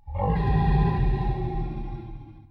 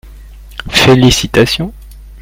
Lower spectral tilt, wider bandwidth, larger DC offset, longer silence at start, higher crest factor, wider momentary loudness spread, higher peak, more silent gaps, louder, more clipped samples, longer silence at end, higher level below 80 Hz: first, -10.5 dB/octave vs -4.5 dB/octave; second, 5 kHz vs 16.5 kHz; neither; about the same, 0.05 s vs 0.05 s; about the same, 14 dB vs 12 dB; second, 16 LU vs 20 LU; second, -10 dBFS vs 0 dBFS; neither; second, -26 LUFS vs -9 LUFS; second, under 0.1% vs 0.3%; about the same, 0.1 s vs 0 s; about the same, -28 dBFS vs -28 dBFS